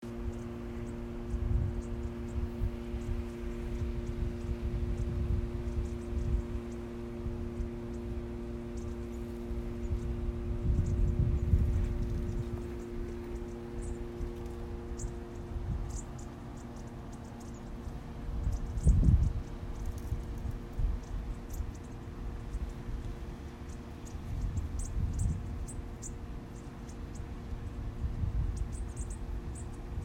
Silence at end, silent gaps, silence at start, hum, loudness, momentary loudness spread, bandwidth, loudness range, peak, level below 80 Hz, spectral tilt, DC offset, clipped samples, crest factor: 0 s; none; 0 s; none; -38 LUFS; 12 LU; 13 kHz; 8 LU; -12 dBFS; -38 dBFS; -7.5 dB/octave; under 0.1%; under 0.1%; 22 dB